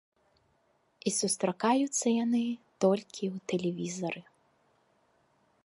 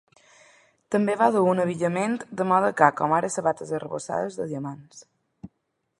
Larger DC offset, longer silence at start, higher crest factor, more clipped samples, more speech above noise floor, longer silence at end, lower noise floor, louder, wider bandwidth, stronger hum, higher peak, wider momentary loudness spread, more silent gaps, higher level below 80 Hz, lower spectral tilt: neither; first, 1.05 s vs 0.9 s; about the same, 20 dB vs 24 dB; neither; second, 42 dB vs 53 dB; first, 1.45 s vs 0.5 s; second, -71 dBFS vs -76 dBFS; second, -31 LUFS vs -24 LUFS; about the same, 11.5 kHz vs 11.5 kHz; neither; second, -12 dBFS vs -2 dBFS; about the same, 9 LU vs 11 LU; neither; second, -80 dBFS vs -68 dBFS; second, -4.5 dB/octave vs -6 dB/octave